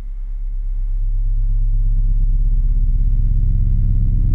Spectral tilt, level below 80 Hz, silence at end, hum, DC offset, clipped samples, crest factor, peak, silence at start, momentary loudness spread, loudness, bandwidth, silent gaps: -11 dB/octave; -16 dBFS; 0 s; none; under 0.1%; under 0.1%; 8 dB; -6 dBFS; 0 s; 9 LU; -21 LUFS; 0.5 kHz; none